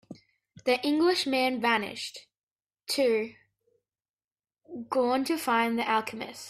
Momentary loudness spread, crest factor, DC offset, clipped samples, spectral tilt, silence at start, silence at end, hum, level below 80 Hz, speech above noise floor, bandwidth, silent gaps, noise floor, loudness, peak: 15 LU; 18 dB; under 0.1%; under 0.1%; -3 dB/octave; 0.1 s; 0 s; none; -74 dBFS; over 63 dB; 15.5 kHz; 2.43-2.47 s, 4.10-4.14 s, 4.24-4.28 s; under -90 dBFS; -27 LUFS; -12 dBFS